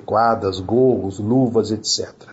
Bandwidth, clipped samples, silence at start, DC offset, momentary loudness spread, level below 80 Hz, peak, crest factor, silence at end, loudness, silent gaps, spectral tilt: 8 kHz; under 0.1%; 0.1 s; under 0.1%; 5 LU; -56 dBFS; -6 dBFS; 14 dB; 0 s; -19 LUFS; none; -5 dB/octave